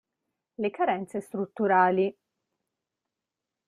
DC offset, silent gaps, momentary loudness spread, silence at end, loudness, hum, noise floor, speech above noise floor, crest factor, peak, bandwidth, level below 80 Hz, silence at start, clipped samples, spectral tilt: under 0.1%; none; 12 LU; 1.55 s; -27 LUFS; none; -88 dBFS; 62 dB; 20 dB; -10 dBFS; 12 kHz; -76 dBFS; 0.6 s; under 0.1%; -7 dB/octave